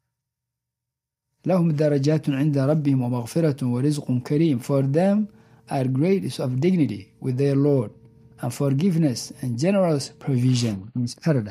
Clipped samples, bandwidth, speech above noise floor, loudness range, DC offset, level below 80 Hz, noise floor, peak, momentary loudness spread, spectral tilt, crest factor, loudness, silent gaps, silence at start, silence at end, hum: under 0.1%; 15 kHz; 64 dB; 2 LU; under 0.1%; -64 dBFS; -86 dBFS; -8 dBFS; 9 LU; -7.5 dB/octave; 14 dB; -23 LUFS; none; 1.45 s; 0 s; none